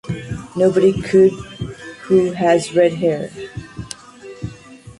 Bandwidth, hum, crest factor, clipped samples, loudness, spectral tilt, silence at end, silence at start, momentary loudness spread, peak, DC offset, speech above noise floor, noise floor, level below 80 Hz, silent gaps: 11.5 kHz; none; 16 dB; under 0.1%; -16 LUFS; -6.5 dB/octave; 0.1 s; 0.05 s; 19 LU; -2 dBFS; under 0.1%; 24 dB; -39 dBFS; -46 dBFS; none